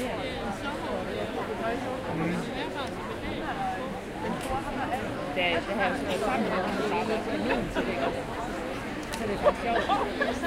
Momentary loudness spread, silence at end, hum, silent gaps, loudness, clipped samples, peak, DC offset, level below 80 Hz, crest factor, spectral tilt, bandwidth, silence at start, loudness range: 7 LU; 0 s; none; none; -30 LUFS; under 0.1%; -10 dBFS; under 0.1%; -46 dBFS; 20 dB; -5 dB/octave; 16 kHz; 0 s; 4 LU